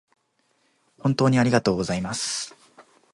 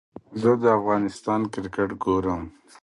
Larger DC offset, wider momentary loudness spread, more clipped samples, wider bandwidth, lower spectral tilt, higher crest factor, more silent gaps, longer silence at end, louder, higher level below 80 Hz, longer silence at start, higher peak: neither; about the same, 9 LU vs 11 LU; neither; about the same, 11.5 kHz vs 11.5 kHz; second, -5 dB/octave vs -7.5 dB/octave; about the same, 20 dB vs 18 dB; neither; about the same, 0.3 s vs 0.35 s; about the same, -23 LUFS vs -24 LUFS; about the same, -54 dBFS vs -50 dBFS; first, 1.05 s vs 0.3 s; about the same, -4 dBFS vs -6 dBFS